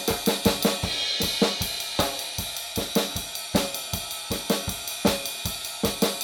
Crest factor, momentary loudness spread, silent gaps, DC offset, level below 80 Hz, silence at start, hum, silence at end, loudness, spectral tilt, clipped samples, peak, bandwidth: 20 dB; 7 LU; none; under 0.1%; -46 dBFS; 0 s; none; 0 s; -26 LUFS; -3 dB/octave; under 0.1%; -6 dBFS; 19 kHz